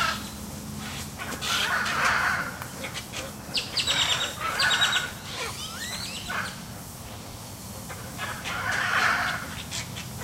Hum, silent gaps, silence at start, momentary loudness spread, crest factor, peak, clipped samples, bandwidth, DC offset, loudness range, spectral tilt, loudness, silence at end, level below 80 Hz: none; none; 0 s; 16 LU; 20 dB; -10 dBFS; under 0.1%; 16 kHz; under 0.1%; 8 LU; -1.5 dB/octave; -27 LUFS; 0 s; -50 dBFS